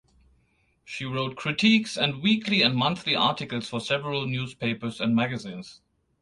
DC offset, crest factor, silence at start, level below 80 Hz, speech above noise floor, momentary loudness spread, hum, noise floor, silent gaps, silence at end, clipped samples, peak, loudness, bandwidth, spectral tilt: under 0.1%; 20 dB; 0.85 s; -62 dBFS; 42 dB; 14 LU; none; -67 dBFS; none; 0.45 s; under 0.1%; -6 dBFS; -25 LUFS; 11 kHz; -5 dB/octave